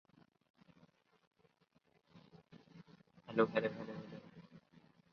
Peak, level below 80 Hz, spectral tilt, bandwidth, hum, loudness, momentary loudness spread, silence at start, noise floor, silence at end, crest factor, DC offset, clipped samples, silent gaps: -18 dBFS; -84 dBFS; -5 dB/octave; 6.6 kHz; none; -39 LUFS; 28 LU; 2.15 s; -76 dBFS; 0.35 s; 28 dB; under 0.1%; under 0.1%; none